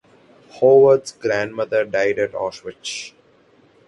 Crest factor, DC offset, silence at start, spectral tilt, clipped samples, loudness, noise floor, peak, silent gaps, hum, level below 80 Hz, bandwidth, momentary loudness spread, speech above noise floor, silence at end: 16 dB; under 0.1%; 0.55 s; -4.5 dB/octave; under 0.1%; -18 LUFS; -54 dBFS; -4 dBFS; none; none; -62 dBFS; 11 kHz; 17 LU; 37 dB; 0.8 s